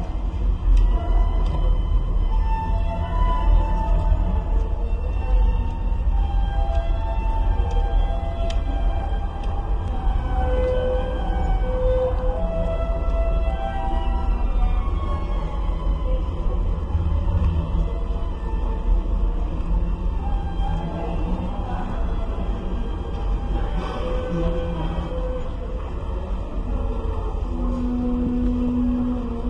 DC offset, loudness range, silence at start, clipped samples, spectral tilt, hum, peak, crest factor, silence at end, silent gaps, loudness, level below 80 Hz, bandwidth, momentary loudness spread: under 0.1%; 4 LU; 0 s; under 0.1%; -8.5 dB/octave; none; -6 dBFS; 14 dB; 0 s; none; -25 LUFS; -22 dBFS; 5.2 kHz; 6 LU